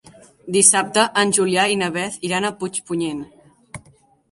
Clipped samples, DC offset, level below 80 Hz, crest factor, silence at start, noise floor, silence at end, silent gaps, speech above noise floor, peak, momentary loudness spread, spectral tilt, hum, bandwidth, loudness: under 0.1%; under 0.1%; -60 dBFS; 20 dB; 0.45 s; -54 dBFS; 0.55 s; none; 35 dB; 0 dBFS; 12 LU; -2.5 dB/octave; none; 11.5 kHz; -18 LUFS